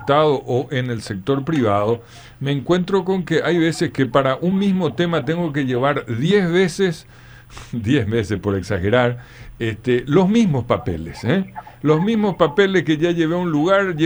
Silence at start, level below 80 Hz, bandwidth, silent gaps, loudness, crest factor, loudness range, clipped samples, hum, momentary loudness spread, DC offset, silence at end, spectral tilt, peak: 0 s; -46 dBFS; over 20 kHz; none; -19 LUFS; 16 dB; 2 LU; under 0.1%; none; 9 LU; under 0.1%; 0 s; -7 dB/octave; -2 dBFS